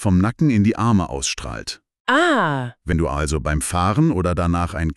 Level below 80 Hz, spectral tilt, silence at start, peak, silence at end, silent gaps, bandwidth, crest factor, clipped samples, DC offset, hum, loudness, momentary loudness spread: -32 dBFS; -5.5 dB/octave; 0 s; -4 dBFS; 0.05 s; 2.00-2.05 s; 13 kHz; 14 dB; under 0.1%; under 0.1%; none; -19 LUFS; 10 LU